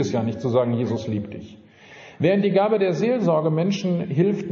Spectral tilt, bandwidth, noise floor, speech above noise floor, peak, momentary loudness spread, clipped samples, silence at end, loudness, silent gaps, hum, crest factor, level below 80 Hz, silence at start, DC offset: -7 dB/octave; 7.2 kHz; -45 dBFS; 24 dB; -6 dBFS; 8 LU; under 0.1%; 0 s; -22 LUFS; none; none; 16 dB; -62 dBFS; 0 s; under 0.1%